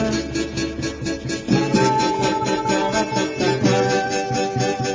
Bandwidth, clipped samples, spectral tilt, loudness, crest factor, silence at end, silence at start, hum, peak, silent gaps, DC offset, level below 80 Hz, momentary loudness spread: 7.6 kHz; under 0.1%; -5 dB/octave; -20 LUFS; 16 dB; 0 s; 0 s; none; -4 dBFS; none; under 0.1%; -42 dBFS; 8 LU